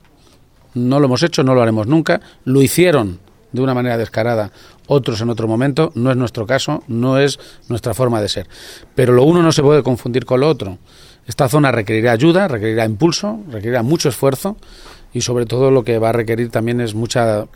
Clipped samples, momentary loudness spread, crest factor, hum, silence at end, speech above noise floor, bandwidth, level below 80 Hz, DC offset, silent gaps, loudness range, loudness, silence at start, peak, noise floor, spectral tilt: under 0.1%; 12 LU; 16 dB; none; 0.1 s; 33 dB; 18 kHz; -44 dBFS; under 0.1%; none; 3 LU; -15 LUFS; 0.75 s; 0 dBFS; -48 dBFS; -6 dB/octave